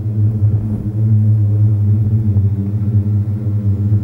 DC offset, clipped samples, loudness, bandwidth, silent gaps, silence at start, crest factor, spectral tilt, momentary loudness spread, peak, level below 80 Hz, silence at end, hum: under 0.1%; under 0.1%; -15 LUFS; 1.5 kHz; none; 0 s; 10 dB; -12 dB/octave; 5 LU; -4 dBFS; -38 dBFS; 0 s; none